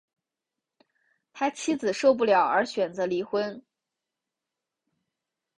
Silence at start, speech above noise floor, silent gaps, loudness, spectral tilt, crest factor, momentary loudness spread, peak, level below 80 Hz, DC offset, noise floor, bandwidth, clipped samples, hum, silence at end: 1.35 s; 63 dB; none; -26 LUFS; -4 dB/octave; 20 dB; 9 LU; -8 dBFS; -74 dBFS; under 0.1%; -88 dBFS; 11 kHz; under 0.1%; none; 2 s